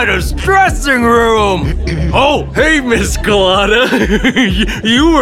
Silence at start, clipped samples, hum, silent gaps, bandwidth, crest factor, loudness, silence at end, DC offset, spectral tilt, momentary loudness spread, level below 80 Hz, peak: 0 s; under 0.1%; none; none; 16.5 kHz; 10 dB; -11 LUFS; 0 s; 0.4%; -4.5 dB/octave; 4 LU; -20 dBFS; 0 dBFS